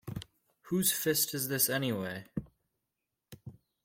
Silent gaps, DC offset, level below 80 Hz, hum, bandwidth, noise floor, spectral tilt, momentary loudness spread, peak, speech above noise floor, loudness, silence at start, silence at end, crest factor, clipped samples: none; under 0.1%; -64 dBFS; none; 16.5 kHz; -87 dBFS; -3 dB/octave; 21 LU; -14 dBFS; 55 dB; -30 LUFS; 0.05 s; 0.3 s; 22 dB; under 0.1%